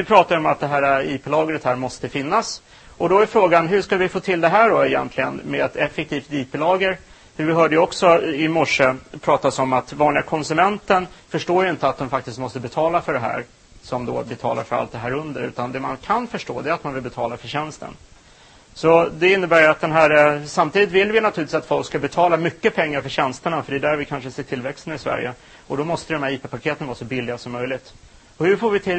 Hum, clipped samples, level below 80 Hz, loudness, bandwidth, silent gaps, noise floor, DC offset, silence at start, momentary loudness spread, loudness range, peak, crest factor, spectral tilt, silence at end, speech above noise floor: none; under 0.1%; -52 dBFS; -20 LUFS; 8.8 kHz; none; -49 dBFS; under 0.1%; 0 s; 13 LU; 9 LU; 0 dBFS; 20 dB; -5.5 dB/octave; 0 s; 29 dB